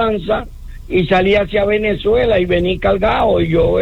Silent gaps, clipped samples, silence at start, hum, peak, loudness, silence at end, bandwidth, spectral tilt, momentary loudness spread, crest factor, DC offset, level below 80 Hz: none; under 0.1%; 0 s; none; -4 dBFS; -15 LUFS; 0 s; 8.6 kHz; -7.5 dB/octave; 6 LU; 12 dB; under 0.1%; -30 dBFS